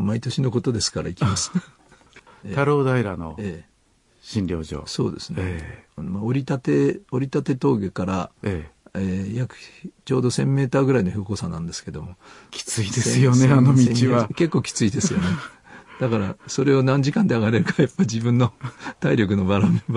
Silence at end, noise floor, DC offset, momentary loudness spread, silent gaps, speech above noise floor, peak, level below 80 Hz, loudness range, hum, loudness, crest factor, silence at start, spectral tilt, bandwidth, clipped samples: 0 s; -61 dBFS; under 0.1%; 15 LU; none; 40 dB; -6 dBFS; -52 dBFS; 7 LU; none; -22 LUFS; 16 dB; 0 s; -6 dB/octave; 11.5 kHz; under 0.1%